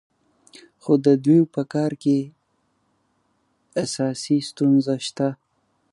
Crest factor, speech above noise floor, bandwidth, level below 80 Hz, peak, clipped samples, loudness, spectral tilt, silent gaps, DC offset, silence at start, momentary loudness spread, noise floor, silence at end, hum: 18 dB; 49 dB; 11.5 kHz; -72 dBFS; -4 dBFS; under 0.1%; -21 LUFS; -6.5 dB/octave; none; under 0.1%; 0.85 s; 11 LU; -69 dBFS; 0.6 s; none